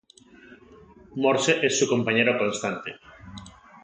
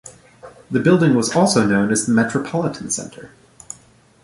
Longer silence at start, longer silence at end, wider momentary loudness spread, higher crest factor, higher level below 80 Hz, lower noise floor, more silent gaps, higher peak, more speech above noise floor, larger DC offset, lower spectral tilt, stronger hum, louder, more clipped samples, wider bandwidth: first, 0.5 s vs 0.05 s; second, 0.35 s vs 0.95 s; about the same, 22 LU vs 22 LU; about the same, 20 dB vs 16 dB; second, -60 dBFS vs -54 dBFS; about the same, -52 dBFS vs -51 dBFS; neither; second, -6 dBFS vs -2 dBFS; second, 28 dB vs 34 dB; neither; second, -3.5 dB/octave vs -5 dB/octave; neither; second, -23 LUFS vs -17 LUFS; neither; second, 9.6 kHz vs 11.5 kHz